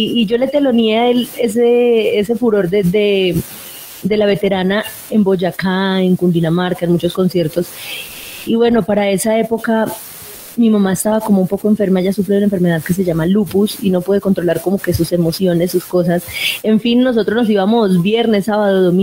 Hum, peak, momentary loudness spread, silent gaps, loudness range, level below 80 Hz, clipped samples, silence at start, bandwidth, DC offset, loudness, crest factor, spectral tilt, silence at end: none; -4 dBFS; 6 LU; none; 2 LU; -46 dBFS; under 0.1%; 0 s; 16.5 kHz; under 0.1%; -14 LUFS; 10 dB; -6 dB/octave; 0 s